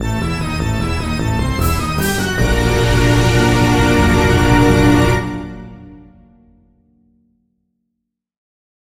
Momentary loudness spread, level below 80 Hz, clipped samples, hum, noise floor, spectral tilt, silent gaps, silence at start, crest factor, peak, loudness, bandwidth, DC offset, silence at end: 8 LU; -24 dBFS; under 0.1%; none; -76 dBFS; -5.5 dB/octave; none; 0 s; 16 dB; 0 dBFS; -14 LUFS; 17 kHz; under 0.1%; 2.95 s